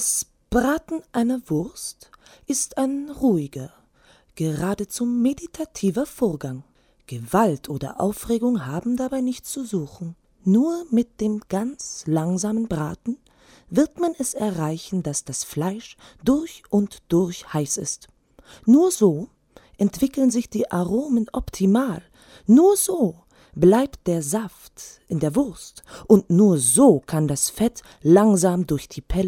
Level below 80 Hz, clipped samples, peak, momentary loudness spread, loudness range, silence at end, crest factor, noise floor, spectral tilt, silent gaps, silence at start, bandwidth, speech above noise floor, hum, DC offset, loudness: -46 dBFS; under 0.1%; -2 dBFS; 16 LU; 6 LU; 0 s; 20 dB; -56 dBFS; -5.5 dB/octave; none; 0 s; 17 kHz; 35 dB; none; under 0.1%; -22 LUFS